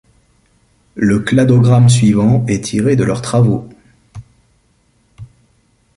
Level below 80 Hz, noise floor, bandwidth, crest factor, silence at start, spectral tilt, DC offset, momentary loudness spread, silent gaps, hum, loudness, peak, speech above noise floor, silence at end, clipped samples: -42 dBFS; -57 dBFS; 11.5 kHz; 14 dB; 0.95 s; -7 dB/octave; under 0.1%; 8 LU; none; none; -12 LUFS; 0 dBFS; 45 dB; 0.7 s; under 0.1%